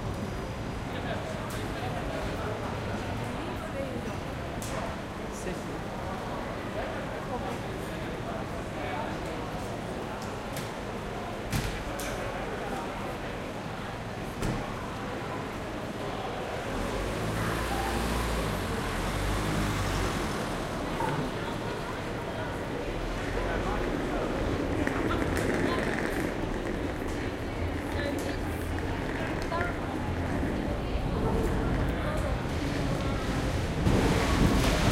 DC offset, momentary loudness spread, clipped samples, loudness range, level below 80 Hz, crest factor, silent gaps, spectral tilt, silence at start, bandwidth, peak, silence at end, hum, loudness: under 0.1%; 7 LU; under 0.1%; 5 LU; -38 dBFS; 20 dB; none; -5.5 dB/octave; 0 s; 16 kHz; -10 dBFS; 0 s; none; -32 LUFS